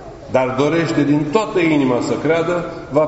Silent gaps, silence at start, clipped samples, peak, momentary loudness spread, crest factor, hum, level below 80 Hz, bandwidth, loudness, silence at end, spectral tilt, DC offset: none; 0 s; under 0.1%; 0 dBFS; 5 LU; 16 dB; none; -46 dBFS; 8 kHz; -17 LUFS; 0 s; -5.5 dB/octave; under 0.1%